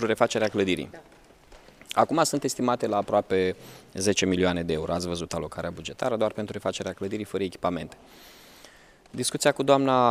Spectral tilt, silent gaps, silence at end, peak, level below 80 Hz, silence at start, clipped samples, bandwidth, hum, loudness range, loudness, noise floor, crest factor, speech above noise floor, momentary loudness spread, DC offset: -4.5 dB/octave; none; 0 s; -4 dBFS; -56 dBFS; 0 s; under 0.1%; 15.5 kHz; none; 6 LU; -26 LUFS; -53 dBFS; 22 dB; 27 dB; 11 LU; under 0.1%